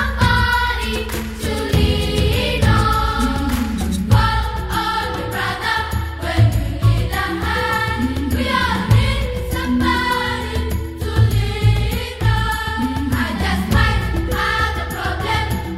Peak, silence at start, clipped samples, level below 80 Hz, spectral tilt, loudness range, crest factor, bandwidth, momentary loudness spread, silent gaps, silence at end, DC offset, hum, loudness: -2 dBFS; 0 s; under 0.1%; -24 dBFS; -5.5 dB/octave; 2 LU; 16 dB; 16 kHz; 7 LU; none; 0 s; under 0.1%; none; -18 LUFS